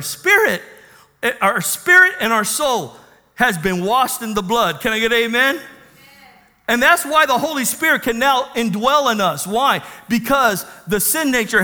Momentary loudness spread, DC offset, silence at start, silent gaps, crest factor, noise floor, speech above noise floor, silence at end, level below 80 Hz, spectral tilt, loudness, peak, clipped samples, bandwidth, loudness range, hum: 9 LU; under 0.1%; 0 s; none; 18 dB; -48 dBFS; 31 dB; 0 s; -48 dBFS; -2.5 dB/octave; -16 LUFS; 0 dBFS; under 0.1%; over 20 kHz; 2 LU; none